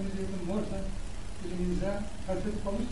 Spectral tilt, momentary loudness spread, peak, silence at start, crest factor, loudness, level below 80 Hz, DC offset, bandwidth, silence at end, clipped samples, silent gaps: -6.5 dB/octave; 9 LU; -18 dBFS; 0 s; 14 dB; -36 LUFS; -40 dBFS; 2%; 11.5 kHz; 0 s; under 0.1%; none